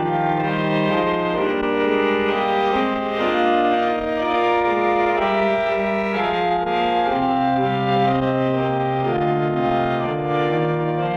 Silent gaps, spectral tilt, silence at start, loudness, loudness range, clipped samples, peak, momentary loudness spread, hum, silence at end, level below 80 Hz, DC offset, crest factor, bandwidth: none; -7.5 dB/octave; 0 s; -20 LUFS; 1 LU; under 0.1%; -6 dBFS; 3 LU; none; 0 s; -48 dBFS; under 0.1%; 12 dB; 7.6 kHz